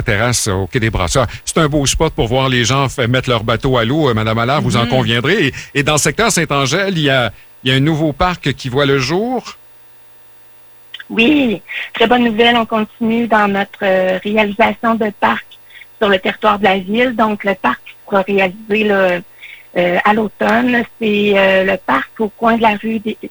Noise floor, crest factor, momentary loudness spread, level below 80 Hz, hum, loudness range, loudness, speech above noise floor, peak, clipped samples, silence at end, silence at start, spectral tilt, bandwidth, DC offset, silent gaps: -40 dBFS; 14 dB; 6 LU; -36 dBFS; 60 Hz at -45 dBFS; 3 LU; -14 LUFS; 26 dB; 0 dBFS; under 0.1%; 0 s; 0 s; -4.5 dB/octave; over 20 kHz; under 0.1%; none